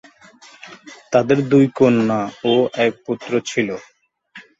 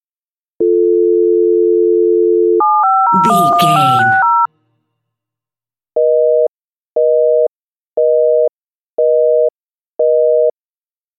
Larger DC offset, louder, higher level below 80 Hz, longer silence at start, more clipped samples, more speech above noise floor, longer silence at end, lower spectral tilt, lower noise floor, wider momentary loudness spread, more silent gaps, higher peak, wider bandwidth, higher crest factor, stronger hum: neither; second, -18 LUFS vs -12 LUFS; first, -60 dBFS vs -68 dBFS; about the same, 0.65 s vs 0.6 s; neither; second, 29 dB vs over 80 dB; second, 0.2 s vs 0.7 s; about the same, -6 dB/octave vs -6 dB/octave; second, -46 dBFS vs under -90 dBFS; first, 17 LU vs 8 LU; second, none vs 6.50-6.86 s, 6.92-6.96 s, 7.48-7.54 s, 7.61-7.92 s, 8.63-8.67 s, 8.75-8.97 s, 9.55-9.92 s; about the same, -2 dBFS vs 0 dBFS; second, 8 kHz vs 14 kHz; first, 18 dB vs 12 dB; neither